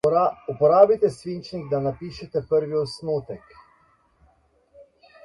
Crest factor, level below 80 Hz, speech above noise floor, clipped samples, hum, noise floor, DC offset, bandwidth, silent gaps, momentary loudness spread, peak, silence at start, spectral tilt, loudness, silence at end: 22 dB; -58 dBFS; 39 dB; under 0.1%; none; -62 dBFS; under 0.1%; 11.5 kHz; none; 17 LU; -2 dBFS; 0.05 s; -7 dB/octave; -22 LUFS; 0.4 s